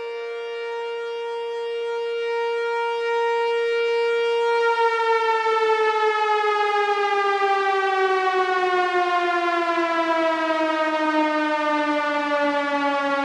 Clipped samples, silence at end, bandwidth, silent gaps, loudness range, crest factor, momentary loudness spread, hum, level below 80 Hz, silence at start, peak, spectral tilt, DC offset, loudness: under 0.1%; 0 s; 11 kHz; none; 4 LU; 14 dB; 8 LU; none; -78 dBFS; 0 s; -8 dBFS; -2 dB/octave; under 0.1%; -22 LUFS